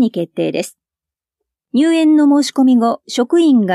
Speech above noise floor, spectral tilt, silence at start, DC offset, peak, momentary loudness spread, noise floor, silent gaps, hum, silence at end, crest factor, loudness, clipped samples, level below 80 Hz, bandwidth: 75 dB; -5 dB/octave; 0 s; under 0.1%; -4 dBFS; 9 LU; -88 dBFS; none; none; 0 s; 10 dB; -14 LUFS; under 0.1%; -74 dBFS; 13 kHz